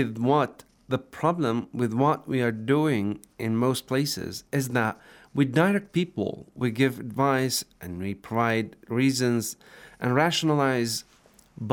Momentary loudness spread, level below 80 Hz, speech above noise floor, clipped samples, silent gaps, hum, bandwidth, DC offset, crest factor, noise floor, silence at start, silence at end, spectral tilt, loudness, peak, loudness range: 10 LU; -64 dBFS; 29 dB; under 0.1%; none; none; over 20 kHz; under 0.1%; 20 dB; -55 dBFS; 0 s; 0 s; -5.5 dB/octave; -26 LUFS; -6 dBFS; 1 LU